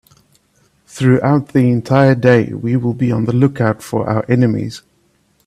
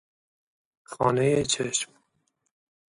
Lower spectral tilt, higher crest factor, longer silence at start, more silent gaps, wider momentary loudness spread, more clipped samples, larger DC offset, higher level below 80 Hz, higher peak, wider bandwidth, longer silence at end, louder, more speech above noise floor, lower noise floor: first, -8 dB/octave vs -4 dB/octave; second, 14 dB vs 20 dB; about the same, 0.95 s vs 0.9 s; neither; second, 6 LU vs 13 LU; neither; neither; first, -50 dBFS vs -60 dBFS; first, 0 dBFS vs -8 dBFS; first, 13 kHz vs 11.5 kHz; second, 0.7 s vs 1.1 s; first, -14 LUFS vs -25 LUFS; second, 45 dB vs 50 dB; second, -58 dBFS vs -74 dBFS